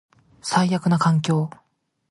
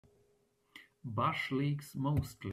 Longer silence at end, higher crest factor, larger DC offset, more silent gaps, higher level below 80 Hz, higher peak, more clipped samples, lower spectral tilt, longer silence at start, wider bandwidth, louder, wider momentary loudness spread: first, 0.6 s vs 0 s; about the same, 18 dB vs 16 dB; neither; neither; about the same, -64 dBFS vs -60 dBFS; first, -6 dBFS vs -20 dBFS; neither; about the same, -6 dB/octave vs -6.5 dB/octave; second, 0.45 s vs 0.75 s; second, 11.5 kHz vs 14.5 kHz; first, -21 LUFS vs -35 LUFS; first, 10 LU vs 7 LU